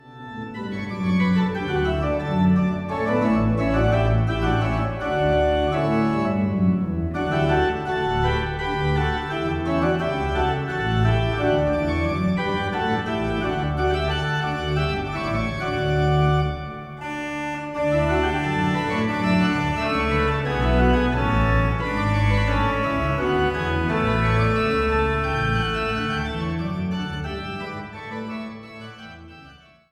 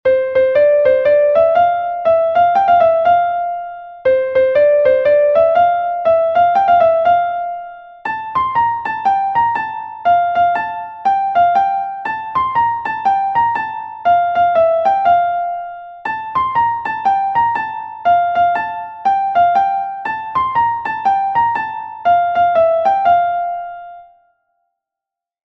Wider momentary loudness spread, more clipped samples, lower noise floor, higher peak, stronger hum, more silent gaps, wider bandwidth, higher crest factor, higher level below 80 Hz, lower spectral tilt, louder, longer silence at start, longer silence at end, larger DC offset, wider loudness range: about the same, 10 LU vs 11 LU; neither; second, -48 dBFS vs -86 dBFS; second, -8 dBFS vs -2 dBFS; neither; neither; first, 11 kHz vs 6 kHz; about the same, 14 dB vs 12 dB; first, -32 dBFS vs -52 dBFS; first, -7.5 dB/octave vs -6 dB/octave; second, -22 LUFS vs -15 LUFS; about the same, 0.05 s vs 0.05 s; second, 0.4 s vs 1.45 s; neither; about the same, 3 LU vs 4 LU